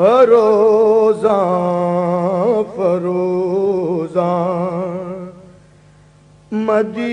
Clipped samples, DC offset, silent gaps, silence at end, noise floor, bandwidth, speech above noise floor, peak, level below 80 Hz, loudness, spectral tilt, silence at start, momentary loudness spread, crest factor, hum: under 0.1%; under 0.1%; none; 0 s; -46 dBFS; 10 kHz; 34 dB; 0 dBFS; -58 dBFS; -15 LUFS; -8 dB/octave; 0 s; 12 LU; 14 dB; none